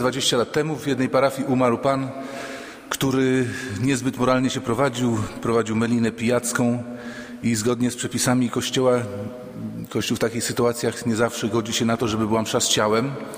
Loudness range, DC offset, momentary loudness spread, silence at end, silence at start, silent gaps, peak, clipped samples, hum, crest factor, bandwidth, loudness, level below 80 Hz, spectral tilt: 2 LU; under 0.1%; 11 LU; 0 s; 0 s; none; -4 dBFS; under 0.1%; none; 18 dB; 16 kHz; -22 LUFS; -54 dBFS; -4.5 dB/octave